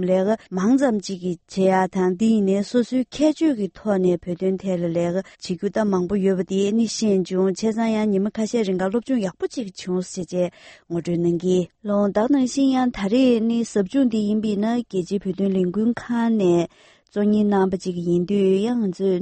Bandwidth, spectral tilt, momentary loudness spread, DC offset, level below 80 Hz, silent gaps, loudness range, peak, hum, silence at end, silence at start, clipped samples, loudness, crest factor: 8.8 kHz; -6.5 dB/octave; 8 LU; under 0.1%; -56 dBFS; none; 3 LU; -6 dBFS; none; 0 s; 0 s; under 0.1%; -21 LUFS; 14 dB